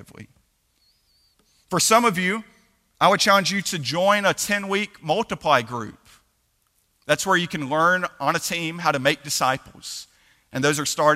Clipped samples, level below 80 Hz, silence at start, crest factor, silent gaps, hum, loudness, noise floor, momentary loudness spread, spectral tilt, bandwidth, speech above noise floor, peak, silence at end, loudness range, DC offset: under 0.1%; -60 dBFS; 0.2 s; 22 dB; none; none; -21 LUFS; -68 dBFS; 14 LU; -3 dB/octave; 16 kHz; 46 dB; -2 dBFS; 0 s; 4 LU; under 0.1%